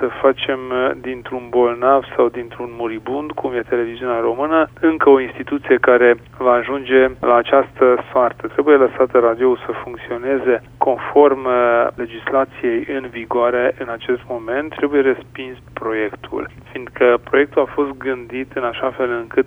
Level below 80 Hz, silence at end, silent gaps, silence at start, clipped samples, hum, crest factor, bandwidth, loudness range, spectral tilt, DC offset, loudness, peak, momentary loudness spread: -50 dBFS; 0 s; none; 0 s; under 0.1%; none; 16 dB; 3.8 kHz; 5 LU; -7.5 dB/octave; under 0.1%; -17 LUFS; 0 dBFS; 13 LU